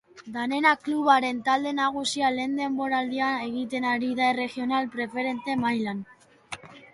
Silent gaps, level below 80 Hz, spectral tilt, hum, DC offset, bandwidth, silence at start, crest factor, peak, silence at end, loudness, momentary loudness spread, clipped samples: none; -68 dBFS; -3.5 dB/octave; none; under 0.1%; 11.5 kHz; 0.15 s; 18 dB; -8 dBFS; 0.15 s; -26 LUFS; 11 LU; under 0.1%